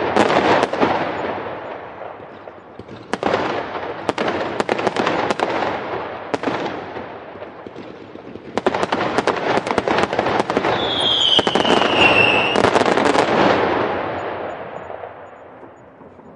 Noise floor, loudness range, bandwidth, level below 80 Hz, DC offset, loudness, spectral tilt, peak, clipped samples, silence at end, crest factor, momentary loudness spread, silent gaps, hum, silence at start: -42 dBFS; 11 LU; 11.5 kHz; -50 dBFS; under 0.1%; -18 LUFS; -4 dB/octave; 0 dBFS; under 0.1%; 0 s; 20 dB; 21 LU; none; none; 0 s